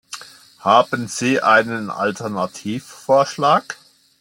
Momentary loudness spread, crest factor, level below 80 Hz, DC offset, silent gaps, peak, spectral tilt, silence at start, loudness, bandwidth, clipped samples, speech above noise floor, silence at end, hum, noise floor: 16 LU; 18 dB; -66 dBFS; under 0.1%; none; -2 dBFS; -4 dB/octave; 0.1 s; -18 LUFS; 17 kHz; under 0.1%; 22 dB; 0.45 s; none; -40 dBFS